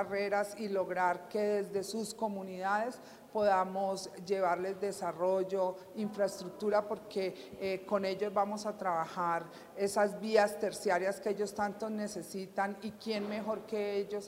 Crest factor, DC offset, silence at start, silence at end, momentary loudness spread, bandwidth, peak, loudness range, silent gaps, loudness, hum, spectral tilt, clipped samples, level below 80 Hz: 22 dB; under 0.1%; 0 s; 0 s; 8 LU; 16 kHz; -14 dBFS; 2 LU; none; -35 LUFS; none; -4.5 dB/octave; under 0.1%; -76 dBFS